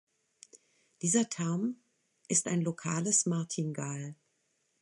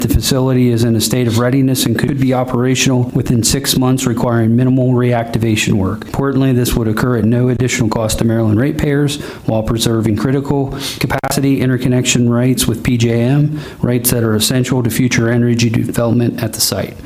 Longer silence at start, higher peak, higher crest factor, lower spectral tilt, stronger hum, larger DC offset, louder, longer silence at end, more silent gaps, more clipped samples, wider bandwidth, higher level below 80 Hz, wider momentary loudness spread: first, 0.55 s vs 0 s; second, -14 dBFS vs 0 dBFS; first, 20 dB vs 12 dB; about the same, -4.5 dB/octave vs -5.5 dB/octave; neither; neither; second, -31 LUFS vs -14 LUFS; first, 0.7 s vs 0 s; neither; neither; second, 11.5 kHz vs 16 kHz; second, -78 dBFS vs -32 dBFS; first, 11 LU vs 4 LU